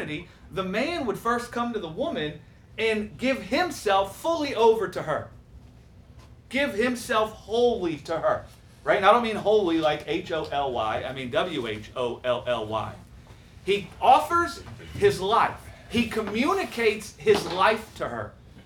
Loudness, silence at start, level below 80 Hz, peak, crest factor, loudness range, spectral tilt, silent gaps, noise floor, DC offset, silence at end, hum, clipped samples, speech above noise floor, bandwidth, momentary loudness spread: -25 LUFS; 0 s; -52 dBFS; -4 dBFS; 22 dB; 4 LU; -4.5 dB/octave; none; -50 dBFS; under 0.1%; 0.05 s; none; under 0.1%; 25 dB; 18.5 kHz; 11 LU